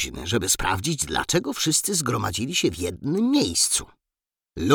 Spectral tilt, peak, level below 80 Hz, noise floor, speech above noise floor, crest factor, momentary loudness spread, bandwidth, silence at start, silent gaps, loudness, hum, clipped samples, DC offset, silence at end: -3 dB/octave; -4 dBFS; -44 dBFS; -89 dBFS; 65 dB; 20 dB; 5 LU; over 20 kHz; 0 s; none; -23 LUFS; none; under 0.1%; under 0.1%; 0 s